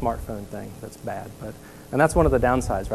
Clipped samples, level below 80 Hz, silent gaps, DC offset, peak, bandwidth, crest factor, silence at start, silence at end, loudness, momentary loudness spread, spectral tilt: under 0.1%; -34 dBFS; none; 0.2%; -6 dBFS; 14 kHz; 18 dB; 0 s; 0 s; -23 LUFS; 19 LU; -6.5 dB/octave